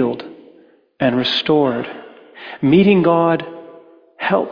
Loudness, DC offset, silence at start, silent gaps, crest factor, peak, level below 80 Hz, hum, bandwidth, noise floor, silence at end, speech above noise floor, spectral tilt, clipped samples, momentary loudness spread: -16 LUFS; under 0.1%; 0 s; none; 16 dB; -2 dBFS; -56 dBFS; none; 5.2 kHz; -50 dBFS; 0 s; 35 dB; -7.5 dB/octave; under 0.1%; 23 LU